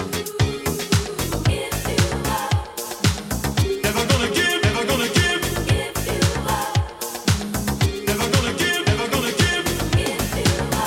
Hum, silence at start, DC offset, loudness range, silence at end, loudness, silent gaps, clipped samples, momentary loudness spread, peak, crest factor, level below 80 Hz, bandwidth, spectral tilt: none; 0 s; under 0.1%; 2 LU; 0 s; -21 LUFS; none; under 0.1%; 6 LU; -4 dBFS; 18 dB; -34 dBFS; 16.5 kHz; -4 dB/octave